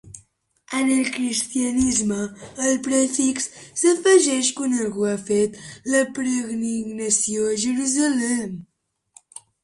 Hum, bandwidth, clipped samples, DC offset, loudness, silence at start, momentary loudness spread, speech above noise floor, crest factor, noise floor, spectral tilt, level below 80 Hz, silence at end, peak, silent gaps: none; 11.5 kHz; under 0.1%; under 0.1%; -21 LUFS; 0.05 s; 9 LU; 38 dB; 18 dB; -59 dBFS; -3 dB/octave; -54 dBFS; 1 s; -4 dBFS; none